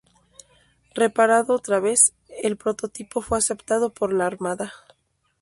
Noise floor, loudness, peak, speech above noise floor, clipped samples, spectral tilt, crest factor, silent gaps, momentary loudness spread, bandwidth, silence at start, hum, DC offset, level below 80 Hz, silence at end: -67 dBFS; -22 LUFS; 0 dBFS; 46 dB; under 0.1%; -3 dB/octave; 22 dB; none; 14 LU; 12 kHz; 0.95 s; none; under 0.1%; -54 dBFS; 0.65 s